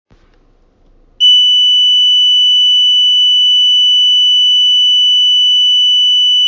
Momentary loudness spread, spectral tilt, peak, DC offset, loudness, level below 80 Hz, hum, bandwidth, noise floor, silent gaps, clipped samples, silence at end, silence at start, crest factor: 1 LU; 4 dB/octave; -2 dBFS; under 0.1%; -6 LUFS; -54 dBFS; none; 7.4 kHz; -49 dBFS; none; under 0.1%; 0 s; 1.2 s; 8 dB